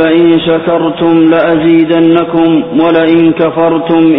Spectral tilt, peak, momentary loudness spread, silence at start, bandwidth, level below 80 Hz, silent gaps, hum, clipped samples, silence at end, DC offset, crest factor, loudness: -10.5 dB/octave; 0 dBFS; 3 LU; 0 s; 4 kHz; -44 dBFS; none; none; under 0.1%; 0 s; 0.5%; 8 dB; -8 LUFS